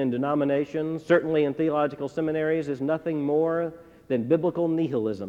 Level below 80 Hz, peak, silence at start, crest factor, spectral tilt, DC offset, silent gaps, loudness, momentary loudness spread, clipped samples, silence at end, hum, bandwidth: -64 dBFS; -8 dBFS; 0 s; 16 dB; -8.5 dB/octave; under 0.1%; none; -26 LUFS; 6 LU; under 0.1%; 0 s; none; 8 kHz